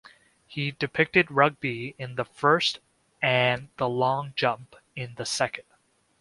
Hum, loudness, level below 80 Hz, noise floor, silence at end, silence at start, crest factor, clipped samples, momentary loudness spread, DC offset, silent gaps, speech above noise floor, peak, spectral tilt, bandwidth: none; -25 LUFS; -64 dBFS; -66 dBFS; 0.6 s; 0.5 s; 24 dB; under 0.1%; 16 LU; under 0.1%; none; 40 dB; -4 dBFS; -4.5 dB/octave; 11.5 kHz